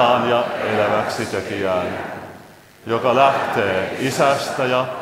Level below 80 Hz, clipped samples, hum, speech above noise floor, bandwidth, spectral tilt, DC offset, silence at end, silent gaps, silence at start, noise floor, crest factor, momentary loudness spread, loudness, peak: -58 dBFS; under 0.1%; none; 25 dB; 16 kHz; -4.5 dB/octave; under 0.1%; 0 s; none; 0 s; -43 dBFS; 18 dB; 12 LU; -19 LUFS; 0 dBFS